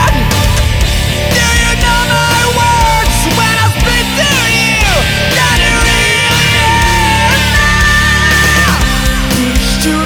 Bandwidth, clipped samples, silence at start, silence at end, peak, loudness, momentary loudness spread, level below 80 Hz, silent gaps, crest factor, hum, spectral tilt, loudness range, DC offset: over 20 kHz; under 0.1%; 0 s; 0 s; 0 dBFS; -9 LUFS; 4 LU; -16 dBFS; none; 10 dB; none; -3.5 dB/octave; 2 LU; under 0.1%